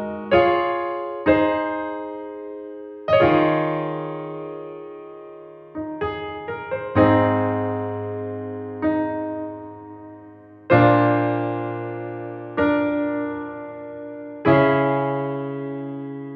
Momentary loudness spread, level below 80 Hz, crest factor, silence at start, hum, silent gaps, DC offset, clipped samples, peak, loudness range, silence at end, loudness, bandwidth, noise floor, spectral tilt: 19 LU; -52 dBFS; 20 dB; 0 s; none; none; under 0.1%; under 0.1%; -4 dBFS; 5 LU; 0 s; -22 LUFS; 5.4 kHz; -44 dBFS; -9.5 dB/octave